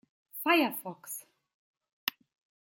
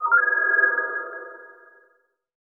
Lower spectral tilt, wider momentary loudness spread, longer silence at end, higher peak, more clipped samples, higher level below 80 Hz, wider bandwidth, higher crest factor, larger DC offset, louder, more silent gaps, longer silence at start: second, -2.5 dB/octave vs -5.5 dB/octave; second, 16 LU vs 19 LU; second, 0.6 s vs 1 s; about the same, -8 dBFS vs -8 dBFS; neither; about the same, -88 dBFS vs under -90 dBFS; first, 17 kHz vs 2.2 kHz; first, 26 dB vs 18 dB; neither; second, -31 LUFS vs -20 LUFS; first, 1.54-1.74 s, 1.93-2.07 s vs none; first, 0.35 s vs 0 s